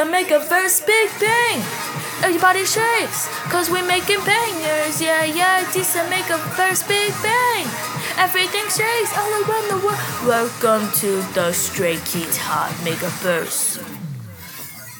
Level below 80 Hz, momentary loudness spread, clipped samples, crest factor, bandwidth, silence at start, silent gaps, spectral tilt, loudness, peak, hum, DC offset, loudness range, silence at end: -60 dBFS; 7 LU; under 0.1%; 18 dB; over 20 kHz; 0 s; none; -2.5 dB/octave; -18 LUFS; -2 dBFS; none; under 0.1%; 3 LU; 0 s